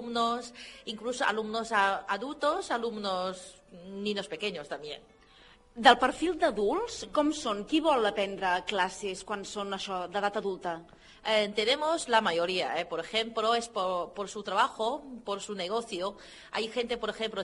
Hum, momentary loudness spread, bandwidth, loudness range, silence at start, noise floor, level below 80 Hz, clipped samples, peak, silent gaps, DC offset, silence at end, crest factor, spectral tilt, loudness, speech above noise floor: none; 12 LU; 11.5 kHz; 5 LU; 0 s; -58 dBFS; -62 dBFS; under 0.1%; -4 dBFS; none; under 0.1%; 0 s; 26 dB; -3 dB/octave; -30 LUFS; 27 dB